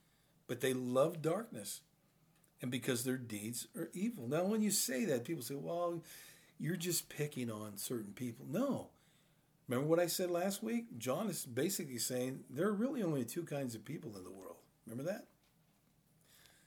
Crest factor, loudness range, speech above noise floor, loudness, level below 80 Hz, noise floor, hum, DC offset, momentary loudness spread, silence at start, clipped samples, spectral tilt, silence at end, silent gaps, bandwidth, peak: 20 dB; 4 LU; 34 dB; -39 LUFS; -84 dBFS; -73 dBFS; none; under 0.1%; 13 LU; 0.5 s; under 0.1%; -4.5 dB/octave; 1.4 s; none; over 20 kHz; -20 dBFS